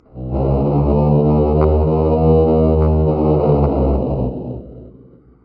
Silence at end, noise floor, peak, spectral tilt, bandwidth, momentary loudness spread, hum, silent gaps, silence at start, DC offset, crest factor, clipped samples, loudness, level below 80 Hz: 0.55 s; -44 dBFS; -2 dBFS; -14.5 dB/octave; 4.6 kHz; 9 LU; none; none; 0.15 s; under 0.1%; 14 dB; under 0.1%; -15 LUFS; -24 dBFS